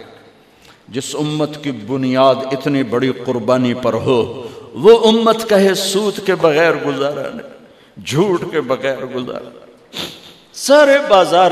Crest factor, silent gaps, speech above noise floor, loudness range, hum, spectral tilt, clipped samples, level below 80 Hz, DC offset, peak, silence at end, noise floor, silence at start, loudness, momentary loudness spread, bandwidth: 16 dB; none; 32 dB; 7 LU; none; -4.5 dB/octave; under 0.1%; -56 dBFS; under 0.1%; 0 dBFS; 0 s; -46 dBFS; 0 s; -15 LUFS; 17 LU; 15 kHz